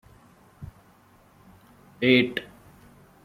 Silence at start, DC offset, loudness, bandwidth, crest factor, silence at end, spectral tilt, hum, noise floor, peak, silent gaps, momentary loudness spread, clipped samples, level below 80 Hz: 0.6 s; under 0.1%; -23 LUFS; 16 kHz; 24 dB; 0.8 s; -6.5 dB/octave; none; -57 dBFS; -4 dBFS; none; 26 LU; under 0.1%; -60 dBFS